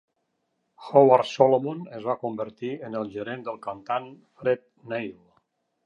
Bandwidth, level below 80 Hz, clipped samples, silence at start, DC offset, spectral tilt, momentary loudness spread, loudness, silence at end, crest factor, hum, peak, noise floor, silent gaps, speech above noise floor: 7.6 kHz; -72 dBFS; under 0.1%; 0.8 s; under 0.1%; -6.5 dB/octave; 15 LU; -25 LUFS; 0.75 s; 24 dB; none; -2 dBFS; -76 dBFS; none; 51 dB